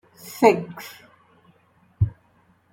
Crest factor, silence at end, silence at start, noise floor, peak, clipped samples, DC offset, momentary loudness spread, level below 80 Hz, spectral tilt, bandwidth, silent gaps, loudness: 22 dB; 0.65 s; 0.25 s; -60 dBFS; -2 dBFS; under 0.1%; under 0.1%; 21 LU; -48 dBFS; -6.5 dB/octave; 17 kHz; none; -22 LUFS